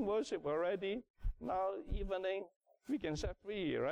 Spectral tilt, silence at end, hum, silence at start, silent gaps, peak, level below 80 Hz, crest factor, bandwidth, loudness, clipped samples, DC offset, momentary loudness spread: -6 dB/octave; 0 s; none; 0 s; 1.10-1.14 s, 2.56-2.60 s; -28 dBFS; -48 dBFS; 10 dB; 10.5 kHz; -40 LUFS; under 0.1%; under 0.1%; 8 LU